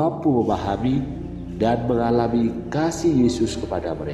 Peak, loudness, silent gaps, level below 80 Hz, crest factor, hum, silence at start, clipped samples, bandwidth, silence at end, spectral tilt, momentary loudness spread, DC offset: -6 dBFS; -22 LUFS; none; -40 dBFS; 16 dB; none; 0 s; under 0.1%; 12 kHz; 0 s; -7 dB/octave; 7 LU; under 0.1%